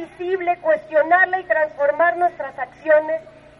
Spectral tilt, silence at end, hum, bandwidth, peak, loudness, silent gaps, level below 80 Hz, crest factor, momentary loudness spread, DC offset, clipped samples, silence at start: -6 dB/octave; 0.3 s; none; 5.4 kHz; -4 dBFS; -19 LUFS; none; -60 dBFS; 16 dB; 12 LU; under 0.1%; under 0.1%; 0 s